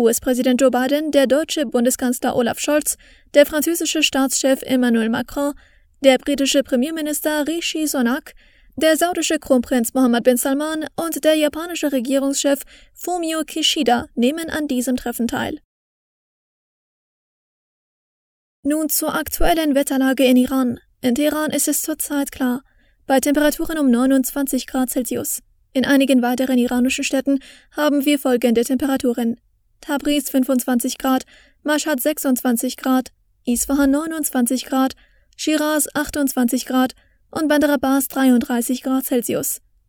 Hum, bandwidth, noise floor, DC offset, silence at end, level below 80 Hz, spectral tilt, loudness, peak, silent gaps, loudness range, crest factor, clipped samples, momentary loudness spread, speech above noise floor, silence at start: none; over 20 kHz; under -90 dBFS; under 0.1%; 0.3 s; -42 dBFS; -2.5 dB/octave; -19 LUFS; 0 dBFS; 15.65-18.63 s; 3 LU; 20 dB; under 0.1%; 8 LU; over 72 dB; 0 s